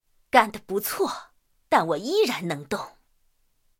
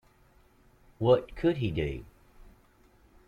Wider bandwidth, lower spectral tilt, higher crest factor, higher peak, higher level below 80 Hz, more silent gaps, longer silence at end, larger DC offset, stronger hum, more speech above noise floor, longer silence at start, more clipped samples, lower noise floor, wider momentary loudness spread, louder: first, 17 kHz vs 6.8 kHz; second, -4 dB/octave vs -8.5 dB/octave; about the same, 24 dB vs 20 dB; first, -2 dBFS vs -12 dBFS; second, -64 dBFS vs -50 dBFS; neither; second, 0.9 s vs 1.2 s; neither; neither; first, 42 dB vs 34 dB; second, 0.35 s vs 1 s; neither; first, -66 dBFS vs -62 dBFS; about the same, 12 LU vs 10 LU; first, -25 LUFS vs -29 LUFS